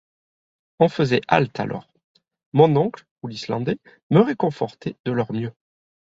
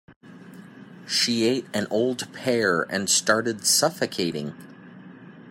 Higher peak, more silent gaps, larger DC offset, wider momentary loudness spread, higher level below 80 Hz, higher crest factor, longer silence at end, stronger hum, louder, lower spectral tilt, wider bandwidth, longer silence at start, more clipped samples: about the same, -2 dBFS vs -4 dBFS; first, 2.04-2.15 s, 2.46-2.52 s, 3.11-3.16 s, 4.03-4.10 s, 5.00-5.04 s vs 0.16-0.21 s; neither; first, 15 LU vs 10 LU; first, -60 dBFS vs -70 dBFS; about the same, 20 dB vs 20 dB; first, 0.6 s vs 0 s; neither; about the same, -22 LUFS vs -23 LUFS; first, -7.5 dB/octave vs -2.5 dB/octave; second, 7.8 kHz vs 16.5 kHz; first, 0.8 s vs 0.1 s; neither